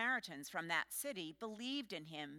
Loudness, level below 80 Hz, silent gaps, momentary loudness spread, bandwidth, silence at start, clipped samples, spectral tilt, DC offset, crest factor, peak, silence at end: -43 LUFS; -82 dBFS; none; 8 LU; 17 kHz; 0 s; under 0.1%; -2.5 dB/octave; under 0.1%; 20 dB; -24 dBFS; 0 s